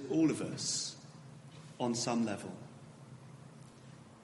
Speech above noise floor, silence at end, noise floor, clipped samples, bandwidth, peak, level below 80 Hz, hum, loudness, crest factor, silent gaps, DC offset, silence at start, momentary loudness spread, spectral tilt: 21 dB; 0 s; -55 dBFS; under 0.1%; 11.5 kHz; -20 dBFS; -78 dBFS; none; -35 LUFS; 18 dB; none; under 0.1%; 0 s; 22 LU; -4 dB/octave